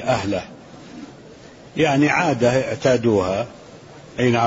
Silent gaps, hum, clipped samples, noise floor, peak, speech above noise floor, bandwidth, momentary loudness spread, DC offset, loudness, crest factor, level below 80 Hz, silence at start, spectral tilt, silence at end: none; none; under 0.1%; -42 dBFS; -4 dBFS; 24 dB; 8 kHz; 22 LU; under 0.1%; -19 LUFS; 16 dB; -52 dBFS; 0 s; -6 dB/octave; 0 s